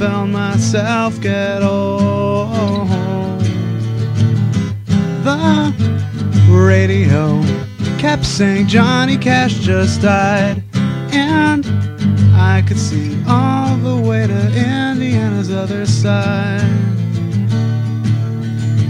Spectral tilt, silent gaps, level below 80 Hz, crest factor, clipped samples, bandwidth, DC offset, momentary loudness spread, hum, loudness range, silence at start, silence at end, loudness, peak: -6.5 dB/octave; none; -42 dBFS; 14 dB; under 0.1%; 10 kHz; under 0.1%; 7 LU; none; 3 LU; 0 s; 0 s; -14 LUFS; 0 dBFS